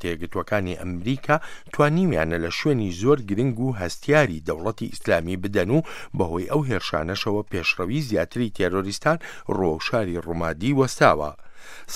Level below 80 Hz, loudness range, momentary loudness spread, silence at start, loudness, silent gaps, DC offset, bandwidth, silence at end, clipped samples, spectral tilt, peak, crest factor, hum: -46 dBFS; 2 LU; 9 LU; 0 s; -24 LUFS; none; under 0.1%; 15.5 kHz; 0 s; under 0.1%; -6 dB/octave; -2 dBFS; 22 dB; none